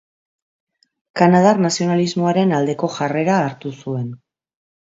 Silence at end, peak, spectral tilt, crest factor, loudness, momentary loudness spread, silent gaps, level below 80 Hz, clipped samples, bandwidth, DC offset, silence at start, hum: 0.8 s; 0 dBFS; -6 dB/octave; 18 dB; -17 LUFS; 13 LU; none; -64 dBFS; under 0.1%; 7.8 kHz; under 0.1%; 1.15 s; none